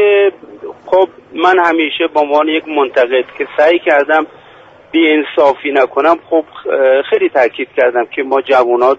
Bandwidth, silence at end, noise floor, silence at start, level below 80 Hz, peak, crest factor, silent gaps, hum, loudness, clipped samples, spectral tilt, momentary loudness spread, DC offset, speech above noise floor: 7.6 kHz; 0 s; -40 dBFS; 0 s; -58 dBFS; 0 dBFS; 12 dB; none; none; -12 LUFS; under 0.1%; -4.5 dB/octave; 6 LU; under 0.1%; 28 dB